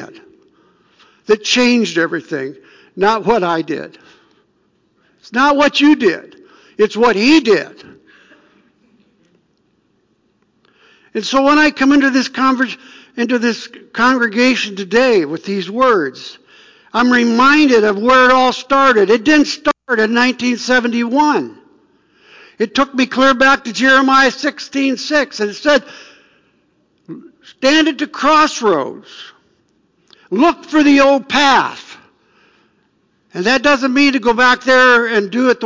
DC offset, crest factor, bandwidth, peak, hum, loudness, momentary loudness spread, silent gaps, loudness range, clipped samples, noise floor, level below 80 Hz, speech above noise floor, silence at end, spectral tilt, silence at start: under 0.1%; 12 dB; 7.6 kHz; -2 dBFS; none; -13 LUFS; 13 LU; none; 5 LU; under 0.1%; -60 dBFS; -54 dBFS; 47 dB; 0 s; -3.5 dB/octave; 0 s